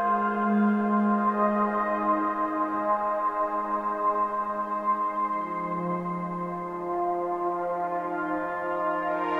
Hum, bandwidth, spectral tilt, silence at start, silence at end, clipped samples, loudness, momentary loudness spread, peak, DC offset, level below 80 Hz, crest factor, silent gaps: none; 5.2 kHz; -9 dB/octave; 0 s; 0 s; under 0.1%; -27 LUFS; 6 LU; -12 dBFS; under 0.1%; -64 dBFS; 14 dB; none